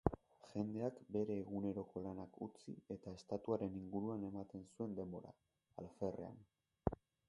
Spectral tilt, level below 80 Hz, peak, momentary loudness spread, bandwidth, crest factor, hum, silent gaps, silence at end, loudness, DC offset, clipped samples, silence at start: -9 dB/octave; -62 dBFS; -16 dBFS; 13 LU; 11 kHz; 30 dB; none; none; 0.35 s; -47 LUFS; under 0.1%; under 0.1%; 0.05 s